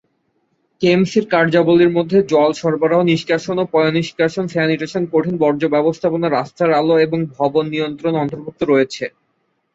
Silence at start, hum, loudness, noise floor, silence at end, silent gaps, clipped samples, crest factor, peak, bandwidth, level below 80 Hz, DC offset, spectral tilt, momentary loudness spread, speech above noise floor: 0.8 s; none; -16 LUFS; -67 dBFS; 0.65 s; none; under 0.1%; 14 dB; -2 dBFS; 8 kHz; -58 dBFS; under 0.1%; -6.5 dB/octave; 6 LU; 51 dB